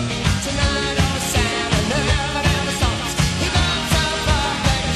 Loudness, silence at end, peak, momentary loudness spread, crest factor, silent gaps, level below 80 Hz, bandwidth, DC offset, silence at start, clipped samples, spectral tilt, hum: -19 LUFS; 0 s; -4 dBFS; 2 LU; 14 dB; none; -26 dBFS; 13.5 kHz; under 0.1%; 0 s; under 0.1%; -4 dB/octave; none